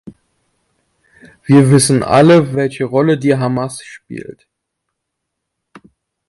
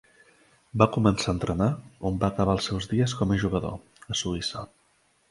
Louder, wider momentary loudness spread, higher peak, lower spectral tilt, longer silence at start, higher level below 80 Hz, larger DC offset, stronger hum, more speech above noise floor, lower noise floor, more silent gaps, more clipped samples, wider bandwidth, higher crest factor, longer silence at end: first, -12 LUFS vs -26 LUFS; first, 21 LU vs 12 LU; about the same, 0 dBFS vs -2 dBFS; about the same, -6 dB/octave vs -5.5 dB/octave; second, 0.05 s vs 0.75 s; second, -50 dBFS vs -44 dBFS; neither; neither; first, 64 dB vs 40 dB; first, -76 dBFS vs -66 dBFS; neither; neither; about the same, 11.5 kHz vs 11.5 kHz; second, 16 dB vs 26 dB; first, 2 s vs 0.65 s